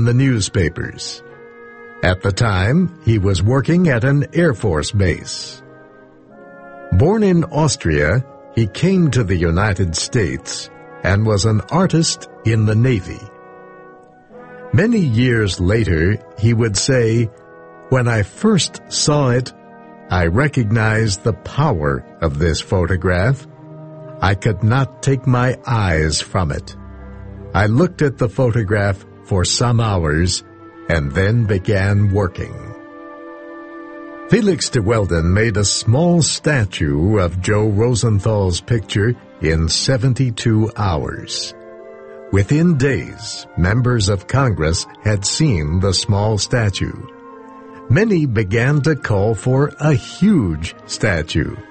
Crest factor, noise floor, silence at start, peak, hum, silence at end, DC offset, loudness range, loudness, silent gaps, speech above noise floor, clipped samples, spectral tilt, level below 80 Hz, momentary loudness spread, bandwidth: 16 dB; -44 dBFS; 0 s; 0 dBFS; none; 0.05 s; under 0.1%; 3 LU; -17 LUFS; none; 28 dB; under 0.1%; -5.5 dB/octave; -34 dBFS; 14 LU; 8.8 kHz